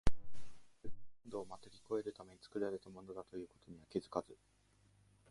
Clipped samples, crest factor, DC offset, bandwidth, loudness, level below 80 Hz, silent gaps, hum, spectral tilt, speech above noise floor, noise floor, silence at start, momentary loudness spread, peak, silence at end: under 0.1%; 22 dB; under 0.1%; 11.5 kHz; -46 LUFS; -52 dBFS; none; none; -6.5 dB/octave; 26 dB; -71 dBFS; 0.05 s; 20 LU; -18 dBFS; 0.95 s